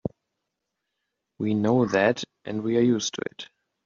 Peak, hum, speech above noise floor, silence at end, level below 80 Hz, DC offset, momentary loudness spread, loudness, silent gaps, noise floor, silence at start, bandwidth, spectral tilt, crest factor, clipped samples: -8 dBFS; none; 58 dB; 0.4 s; -64 dBFS; under 0.1%; 14 LU; -25 LUFS; none; -82 dBFS; 0.05 s; 7.4 kHz; -5 dB/octave; 20 dB; under 0.1%